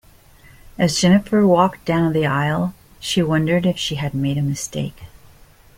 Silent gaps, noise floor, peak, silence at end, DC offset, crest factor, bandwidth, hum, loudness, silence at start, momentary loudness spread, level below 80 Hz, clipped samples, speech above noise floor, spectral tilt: none; -48 dBFS; -2 dBFS; 0.7 s; under 0.1%; 16 dB; 16.5 kHz; none; -19 LUFS; 0.8 s; 11 LU; -46 dBFS; under 0.1%; 30 dB; -5.5 dB/octave